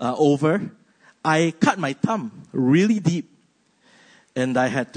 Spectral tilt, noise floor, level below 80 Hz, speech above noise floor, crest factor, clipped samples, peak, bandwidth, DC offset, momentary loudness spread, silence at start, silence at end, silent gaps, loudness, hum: -6 dB/octave; -62 dBFS; -66 dBFS; 42 dB; 18 dB; under 0.1%; -4 dBFS; 9.6 kHz; under 0.1%; 11 LU; 0 s; 0 s; none; -21 LUFS; none